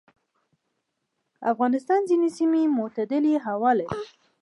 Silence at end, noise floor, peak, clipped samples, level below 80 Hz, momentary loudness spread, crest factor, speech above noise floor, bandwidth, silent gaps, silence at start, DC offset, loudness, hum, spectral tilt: 0.35 s; -78 dBFS; -10 dBFS; under 0.1%; -66 dBFS; 9 LU; 16 dB; 55 dB; 11.5 kHz; none; 1.4 s; under 0.1%; -24 LUFS; none; -6.5 dB/octave